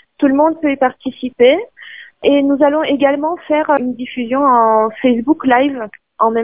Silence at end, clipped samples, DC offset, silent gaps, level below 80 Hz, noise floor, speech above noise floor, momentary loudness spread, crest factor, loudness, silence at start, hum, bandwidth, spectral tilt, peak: 0 s; under 0.1%; 0.2%; none; -56 dBFS; -36 dBFS; 23 dB; 12 LU; 14 dB; -14 LUFS; 0.2 s; none; 3.8 kHz; -8.5 dB/octave; 0 dBFS